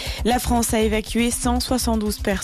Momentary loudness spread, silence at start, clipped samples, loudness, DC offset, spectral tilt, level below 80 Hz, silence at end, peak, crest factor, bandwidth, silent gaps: 3 LU; 0 s; under 0.1%; -21 LUFS; under 0.1%; -4 dB/octave; -30 dBFS; 0 s; -10 dBFS; 12 dB; 14 kHz; none